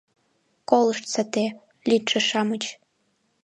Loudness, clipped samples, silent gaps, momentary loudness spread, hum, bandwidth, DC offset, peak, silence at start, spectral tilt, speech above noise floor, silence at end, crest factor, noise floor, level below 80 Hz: -23 LUFS; under 0.1%; none; 10 LU; none; 11 kHz; under 0.1%; -4 dBFS; 0.7 s; -3.5 dB/octave; 47 dB; 0.7 s; 22 dB; -70 dBFS; -74 dBFS